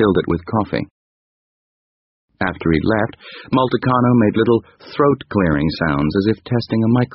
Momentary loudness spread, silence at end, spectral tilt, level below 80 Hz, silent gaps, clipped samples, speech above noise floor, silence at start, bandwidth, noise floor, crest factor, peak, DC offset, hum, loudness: 9 LU; 0 s; -6 dB/octave; -40 dBFS; 0.91-2.28 s; under 0.1%; over 73 dB; 0 s; 5.8 kHz; under -90 dBFS; 16 dB; -2 dBFS; under 0.1%; none; -18 LUFS